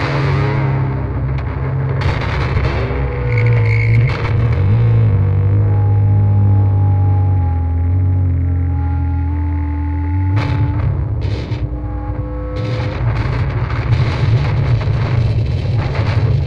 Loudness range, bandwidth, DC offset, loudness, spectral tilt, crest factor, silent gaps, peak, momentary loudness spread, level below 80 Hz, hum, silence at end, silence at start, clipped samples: 6 LU; 6 kHz; under 0.1%; -16 LUFS; -9 dB/octave; 14 dB; none; -2 dBFS; 7 LU; -24 dBFS; none; 0 s; 0 s; under 0.1%